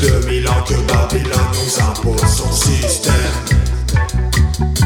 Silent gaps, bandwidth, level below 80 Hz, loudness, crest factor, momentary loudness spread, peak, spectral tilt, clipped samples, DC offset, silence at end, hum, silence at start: none; 18 kHz; -18 dBFS; -15 LUFS; 14 dB; 2 LU; 0 dBFS; -4.5 dB/octave; under 0.1%; under 0.1%; 0 s; none; 0 s